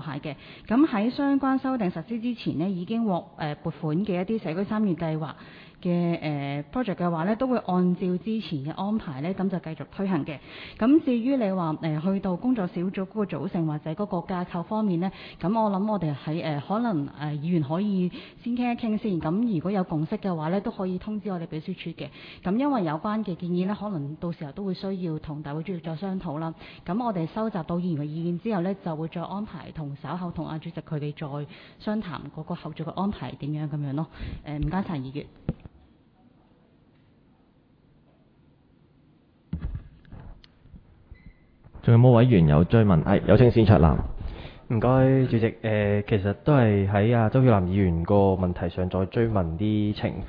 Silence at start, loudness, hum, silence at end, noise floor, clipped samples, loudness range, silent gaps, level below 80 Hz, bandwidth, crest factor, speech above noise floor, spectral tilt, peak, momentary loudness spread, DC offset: 0 s; -26 LUFS; none; 0 s; -60 dBFS; under 0.1%; 12 LU; none; -44 dBFS; 5.2 kHz; 24 dB; 35 dB; -11 dB/octave; -2 dBFS; 15 LU; under 0.1%